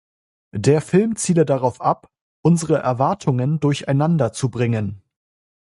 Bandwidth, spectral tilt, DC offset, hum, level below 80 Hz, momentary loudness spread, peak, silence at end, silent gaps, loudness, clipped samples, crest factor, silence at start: 11.5 kHz; -6.5 dB/octave; under 0.1%; none; -52 dBFS; 5 LU; -2 dBFS; 0.75 s; 2.21-2.43 s; -19 LUFS; under 0.1%; 18 dB; 0.55 s